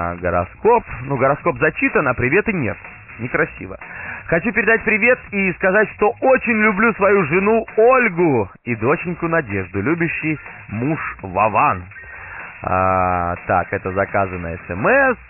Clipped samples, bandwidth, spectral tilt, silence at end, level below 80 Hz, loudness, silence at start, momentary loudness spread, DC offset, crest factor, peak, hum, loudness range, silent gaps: under 0.1%; 3 kHz; -1.5 dB/octave; 0.05 s; -44 dBFS; -17 LUFS; 0 s; 14 LU; under 0.1%; 16 dB; -2 dBFS; none; 5 LU; none